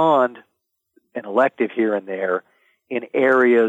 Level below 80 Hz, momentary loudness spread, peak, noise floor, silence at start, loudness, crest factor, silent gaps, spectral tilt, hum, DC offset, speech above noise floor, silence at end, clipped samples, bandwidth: -74 dBFS; 13 LU; -4 dBFS; -64 dBFS; 0 s; -20 LUFS; 16 dB; none; -7 dB/octave; none; under 0.1%; 46 dB; 0 s; under 0.1%; 7.8 kHz